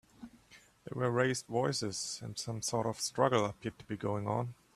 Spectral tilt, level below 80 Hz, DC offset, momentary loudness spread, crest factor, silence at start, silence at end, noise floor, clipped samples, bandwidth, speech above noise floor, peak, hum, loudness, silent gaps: -4.5 dB/octave; -68 dBFS; under 0.1%; 15 LU; 22 dB; 0.2 s; 0.25 s; -62 dBFS; under 0.1%; 13.5 kHz; 27 dB; -14 dBFS; none; -34 LUFS; none